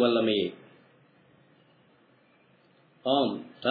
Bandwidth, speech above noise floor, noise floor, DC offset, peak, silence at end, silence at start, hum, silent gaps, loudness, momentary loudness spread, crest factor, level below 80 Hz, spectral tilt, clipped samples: 4.9 kHz; 36 dB; -63 dBFS; under 0.1%; -10 dBFS; 0 s; 0 s; none; none; -28 LUFS; 11 LU; 20 dB; -82 dBFS; -8 dB/octave; under 0.1%